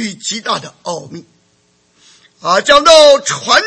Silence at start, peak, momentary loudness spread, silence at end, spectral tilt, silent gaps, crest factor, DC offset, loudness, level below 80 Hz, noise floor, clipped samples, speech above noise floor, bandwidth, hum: 0 s; 0 dBFS; 19 LU; 0 s; -1.5 dB/octave; none; 12 dB; under 0.1%; -9 LUFS; -48 dBFS; -56 dBFS; 0.7%; 45 dB; 11 kHz; none